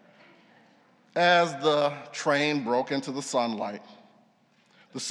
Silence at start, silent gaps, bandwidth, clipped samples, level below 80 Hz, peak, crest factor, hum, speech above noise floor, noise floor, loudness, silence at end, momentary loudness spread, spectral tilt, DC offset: 1.15 s; none; 12 kHz; under 0.1%; -90 dBFS; -8 dBFS; 20 dB; none; 38 dB; -64 dBFS; -26 LUFS; 0 s; 14 LU; -4 dB/octave; under 0.1%